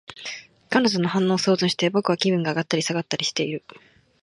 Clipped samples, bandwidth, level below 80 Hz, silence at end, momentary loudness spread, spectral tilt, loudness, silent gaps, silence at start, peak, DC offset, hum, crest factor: under 0.1%; 11.5 kHz; -68 dBFS; 0.65 s; 14 LU; -4.5 dB/octave; -22 LUFS; none; 0.1 s; -4 dBFS; under 0.1%; none; 20 dB